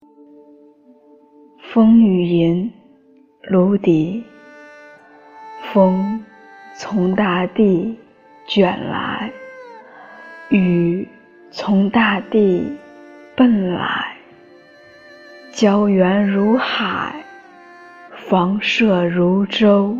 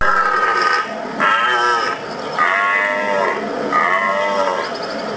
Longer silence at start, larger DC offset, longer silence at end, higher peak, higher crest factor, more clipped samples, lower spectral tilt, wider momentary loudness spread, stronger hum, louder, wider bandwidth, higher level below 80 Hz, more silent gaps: first, 1.65 s vs 0 s; neither; about the same, 0 s vs 0 s; about the same, -2 dBFS vs -2 dBFS; about the same, 16 dB vs 16 dB; neither; first, -7 dB/octave vs -3 dB/octave; first, 19 LU vs 8 LU; neither; about the same, -16 LUFS vs -16 LUFS; about the same, 7.4 kHz vs 8 kHz; about the same, -56 dBFS vs -56 dBFS; neither